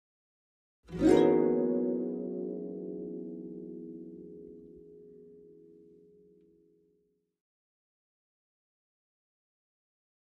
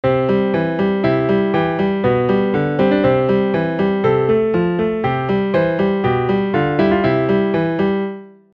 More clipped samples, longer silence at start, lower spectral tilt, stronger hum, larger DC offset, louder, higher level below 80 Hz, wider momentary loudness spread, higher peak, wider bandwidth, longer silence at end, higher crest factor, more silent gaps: neither; first, 0.9 s vs 0.05 s; second, -7 dB/octave vs -9.5 dB/octave; neither; neither; second, -30 LUFS vs -17 LUFS; second, -62 dBFS vs -44 dBFS; first, 25 LU vs 3 LU; second, -12 dBFS vs -2 dBFS; first, 8 kHz vs 5.8 kHz; first, 4.7 s vs 0.25 s; first, 22 dB vs 14 dB; neither